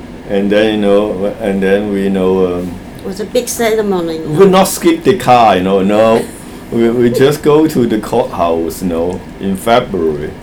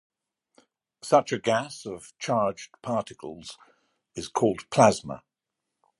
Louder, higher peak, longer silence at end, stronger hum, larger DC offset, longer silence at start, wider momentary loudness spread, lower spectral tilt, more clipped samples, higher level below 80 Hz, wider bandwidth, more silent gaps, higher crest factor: first, -12 LUFS vs -25 LUFS; first, 0 dBFS vs -4 dBFS; second, 0 s vs 0.85 s; neither; neither; second, 0 s vs 1.05 s; second, 11 LU vs 21 LU; about the same, -5.5 dB/octave vs -5 dB/octave; first, 0.4% vs under 0.1%; first, -38 dBFS vs -64 dBFS; first, over 20 kHz vs 11.5 kHz; neither; second, 12 dB vs 24 dB